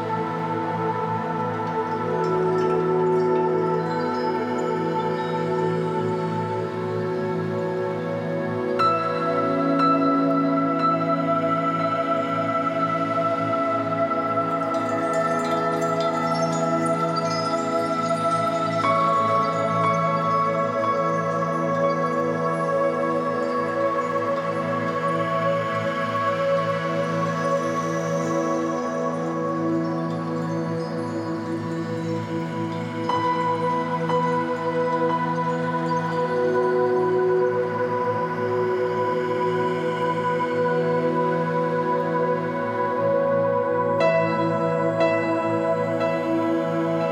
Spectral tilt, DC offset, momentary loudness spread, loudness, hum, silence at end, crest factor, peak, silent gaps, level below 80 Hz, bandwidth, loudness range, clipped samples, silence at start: -7 dB/octave; under 0.1%; 5 LU; -23 LUFS; none; 0 s; 14 dB; -8 dBFS; none; -68 dBFS; 11.5 kHz; 4 LU; under 0.1%; 0 s